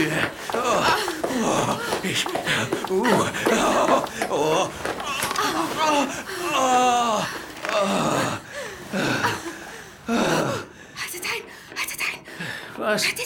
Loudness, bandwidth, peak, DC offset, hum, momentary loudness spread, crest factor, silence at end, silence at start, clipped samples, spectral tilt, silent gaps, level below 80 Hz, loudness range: -23 LUFS; over 20 kHz; -6 dBFS; under 0.1%; none; 12 LU; 18 dB; 0 s; 0 s; under 0.1%; -3.5 dB/octave; none; -54 dBFS; 4 LU